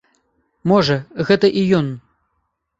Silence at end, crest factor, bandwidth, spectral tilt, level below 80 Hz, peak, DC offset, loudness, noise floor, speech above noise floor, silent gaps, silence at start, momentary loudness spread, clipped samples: 0.8 s; 18 dB; 7.8 kHz; -7 dB/octave; -52 dBFS; -2 dBFS; under 0.1%; -17 LUFS; -71 dBFS; 55 dB; none; 0.65 s; 11 LU; under 0.1%